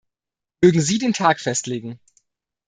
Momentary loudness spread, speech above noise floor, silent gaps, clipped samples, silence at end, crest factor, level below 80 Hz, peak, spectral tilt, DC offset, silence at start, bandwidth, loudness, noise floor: 13 LU; 68 dB; none; under 0.1%; 0.7 s; 20 dB; -58 dBFS; -2 dBFS; -4.5 dB/octave; under 0.1%; 0.6 s; 9.6 kHz; -19 LUFS; -87 dBFS